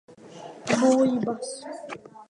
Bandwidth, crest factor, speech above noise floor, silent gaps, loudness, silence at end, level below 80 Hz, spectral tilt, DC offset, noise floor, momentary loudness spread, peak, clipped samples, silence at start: 11 kHz; 18 dB; 19 dB; none; -24 LUFS; 0.05 s; -70 dBFS; -5 dB/octave; under 0.1%; -44 dBFS; 21 LU; -8 dBFS; under 0.1%; 0.25 s